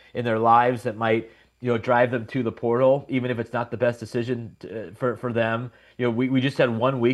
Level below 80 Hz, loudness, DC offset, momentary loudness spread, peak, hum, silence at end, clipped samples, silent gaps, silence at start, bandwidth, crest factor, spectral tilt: -64 dBFS; -23 LUFS; under 0.1%; 11 LU; -6 dBFS; none; 0 s; under 0.1%; none; 0.15 s; 12 kHz; 18 dB; -7.5 dB/octave